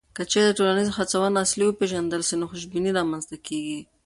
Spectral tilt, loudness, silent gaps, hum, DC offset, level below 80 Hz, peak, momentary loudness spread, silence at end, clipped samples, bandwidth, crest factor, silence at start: -3.5 dB/octave; -24 LUFS; none; none; under 0.1%; -58 dBFS; -8 dBFS; 10 LU; 0.25 s; under 0.1%; 11.5 kHz; 16 dB; 0.15 s